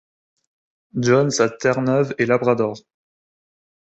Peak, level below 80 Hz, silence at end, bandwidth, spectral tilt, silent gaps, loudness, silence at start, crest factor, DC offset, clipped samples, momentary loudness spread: -2 dBFS; -60 dBFS; 1 s; 8.2 kHz; -5.5 dB/octave; none; -19 LUFS; 0.95 s; 18 dB; under 0.1%; under 0.1%; 8 LU